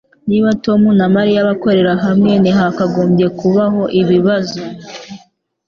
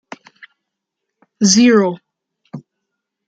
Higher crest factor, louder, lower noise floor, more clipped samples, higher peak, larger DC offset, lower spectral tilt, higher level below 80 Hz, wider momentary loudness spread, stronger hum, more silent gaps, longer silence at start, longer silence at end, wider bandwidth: second, 12 dB vs 18 dB; about the same, -13 LUFS vs -12 LUFS; second, -50 dBFS vs -78 dBFS; neither; about the same, 0 dBFS vs 0 dBFS; neither; first, -7.5 dB/octave vs -4 dB/octave; first, -48 dBFS vs -64 dBFS; second, 12 LU vs 26 LU; neither; neither; second, 0.25 s vs 1.4 s; second, 0.5 s vs 0.7 s; second, 7 kHz vs 9.4 kHz